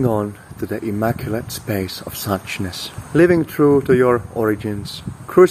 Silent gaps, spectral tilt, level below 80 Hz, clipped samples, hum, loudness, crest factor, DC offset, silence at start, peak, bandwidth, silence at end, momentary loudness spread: none; -6.5 dB/octave; -46 dBFS; under 0.1%; none; -19 LUFS; 18 dB; under 0.1%; 0 s; 0 dBFS; 16 kHz; 0 s; 13 LU